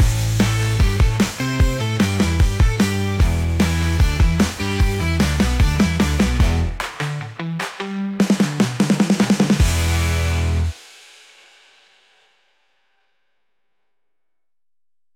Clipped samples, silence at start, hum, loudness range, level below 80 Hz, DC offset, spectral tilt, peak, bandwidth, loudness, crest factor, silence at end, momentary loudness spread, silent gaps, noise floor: under 0.1%; 0 s; none; 4 LU; -24 dBFS; under 0.1%; -5.5 dB/octave; -6 dBFS; 17 kHz; -19 LUFS; 14 dB; 4.4 s; 9 LU; none; -86 dBFS